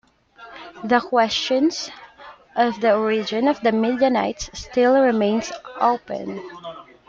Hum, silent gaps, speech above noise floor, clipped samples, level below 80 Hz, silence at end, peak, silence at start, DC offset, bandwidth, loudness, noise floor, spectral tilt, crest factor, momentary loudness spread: none; none; 26 dB; under 0.1%; -52 dBFS; 0.25 s; -4 dBFS; 0.4 s; under 0.1%; 7.6 kHz; -20 LUFS; -46 dBFS; -4 dB/octave; 18 dB; 16 LU